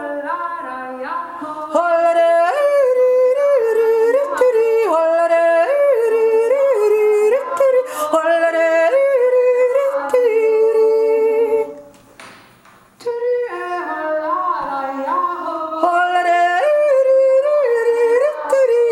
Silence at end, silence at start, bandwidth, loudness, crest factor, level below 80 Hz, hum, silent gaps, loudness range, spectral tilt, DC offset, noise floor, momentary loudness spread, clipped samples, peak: 0 s; 0 s; 13.5 kHz; -15 LUFS; 14 dB; -66 dBFS; none; none; 7 LU; -3 dB/octave; under 0.1%; -48 dBFS; 9 LU; under 0.1%; -2 dBFS